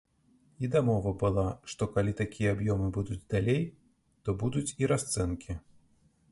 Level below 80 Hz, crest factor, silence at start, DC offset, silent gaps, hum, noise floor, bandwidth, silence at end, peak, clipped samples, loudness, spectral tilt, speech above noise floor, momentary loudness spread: -48 dBFS; 18 dB; 0.6 s; under 0.1%; none; none; -66 dBFS; 11.5 kHz; 0.7 s; -14 dBFS; under 0.1%; -31 LUFS; -6.5 dB/octave; 36 dB; 9 LU